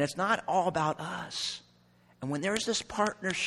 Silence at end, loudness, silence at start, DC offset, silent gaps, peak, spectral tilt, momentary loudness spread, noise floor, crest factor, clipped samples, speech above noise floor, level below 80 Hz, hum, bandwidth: 0 s; -31 LUFS; 0 s; under 0.1%; none; -14 dBFS; -3.5 dB/octave; 9 LU; -63 dBFS; 18 dB; under 0.1%; 32 dB; -64 dBFS; none; 14 kHz